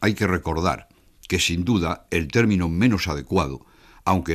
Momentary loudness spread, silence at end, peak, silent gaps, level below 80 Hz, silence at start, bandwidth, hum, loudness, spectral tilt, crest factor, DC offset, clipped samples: 8 LU; 0 s; -6 dBFS; none; -40 dBFS; 0 s; 15.5 kHz; none; -23 LUFS; -5.5 dB/octave; 16 dB; under 0.1%; under 0.1%